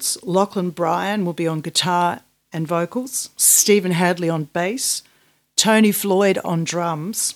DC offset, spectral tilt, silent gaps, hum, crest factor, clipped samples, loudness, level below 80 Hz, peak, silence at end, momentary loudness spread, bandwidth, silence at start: under 0.1%; -3.5 dB/octave; none; none; 20 dB; under 0.1%; -18 LUFS; -68 dBFS; 0 dBFS; 0.05 s; 10 LU; 19.5 kHz; 0 s